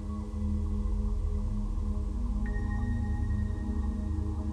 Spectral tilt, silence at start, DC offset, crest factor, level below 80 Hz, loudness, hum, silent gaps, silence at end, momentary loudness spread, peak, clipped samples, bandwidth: -9 dB/octave; 0 s; under 0.1%; 12 dB; -32 dBFS; -34 LUFS; none; none; 0 s; 2 LU; -20 dBFS; under 0.1%; 9.6 kHz